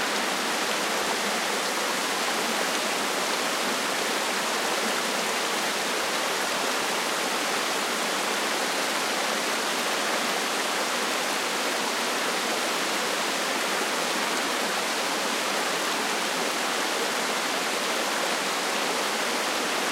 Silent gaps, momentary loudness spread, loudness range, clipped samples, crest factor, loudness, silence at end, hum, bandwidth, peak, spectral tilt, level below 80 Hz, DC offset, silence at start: none; 1 LU; 0 LU; under 0.1%; 14 dB; -25 LUFS; 0 s; none; 16 kHz; -12 dBFS; -1 dB/octave; -78 dBFS; under 0.1%; 0 s